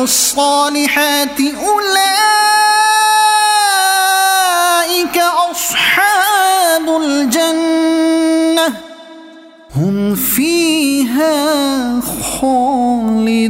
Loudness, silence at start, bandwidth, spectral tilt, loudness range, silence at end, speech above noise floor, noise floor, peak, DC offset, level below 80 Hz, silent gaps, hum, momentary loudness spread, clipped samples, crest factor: -12 LUFS; 0 s; 16.5 kHz; -2.5 dB/octave; 4 LU; 0 s; 25 dB; -37 dBFS; 0 dBFS; under 0.1%; -48 dBFS; none; none; 5 LU; under 0.1%; 12 dB